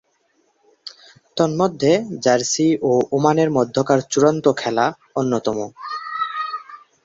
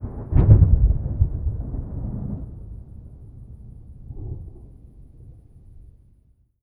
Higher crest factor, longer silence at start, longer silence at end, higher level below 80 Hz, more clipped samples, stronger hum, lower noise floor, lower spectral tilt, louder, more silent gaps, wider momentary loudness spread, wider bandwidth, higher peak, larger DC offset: about the same, 18 dB vs 22 dB; first, 0.85 s vs 0 s; second, 0.3 s vs 0.8 s; second, -60 dBFS vs -26 dBFS; neither; neither; first, -64 dBFS vs -58 dBFS; second, -5 dB/octave vs -13 dB/octave; about the same, -19 LUFS vs -21 LUFS; neither; second, 13 LU vs 28 LU; first, 8 kHz vs 2.3 kHz; about the same, -2 dBFS vs 0 dBFS; neither